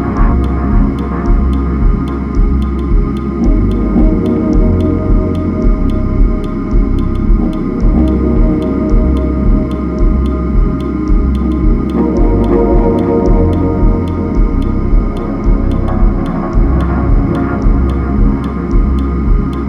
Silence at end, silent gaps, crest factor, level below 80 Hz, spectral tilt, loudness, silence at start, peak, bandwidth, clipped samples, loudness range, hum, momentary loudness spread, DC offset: 0 s; none; 10 dB; -12 dBFS; -10 dB/octave; -13 LUFS; 0 s; 0 dBFS; 5.4 kHz; under 0.1%; 2 LU; none; 4 LU; under 0.1%